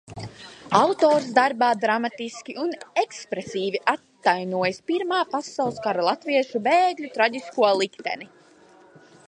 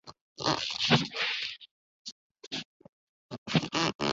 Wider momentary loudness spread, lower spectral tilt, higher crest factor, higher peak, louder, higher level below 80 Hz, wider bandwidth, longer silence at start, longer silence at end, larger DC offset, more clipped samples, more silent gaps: second, 12 LU vs 21 LU; first, -4 dB/octave vs -2.5 dB/octave; about the same, 22 dB vs 24 dB; first, -2 dBFS vs -10 dBFS; first, -23 LUFS vs -30 LUFS; about the same, -66 dBFS vs -64 dBFS; first, 11 kHz vs 8 kHz; about the same, 0.1 s vs 0.05 s; first, 1.05 s vs 0 s; neither; neither; second, none vs 0.21-0.36 s, 1.71-2.05 s, 2.12-2.35 s, 2.47-2.51 s, 2.65-2.80 s, 2.89-3.29 s, 3.38-3.46 s, 3.95-3.99 s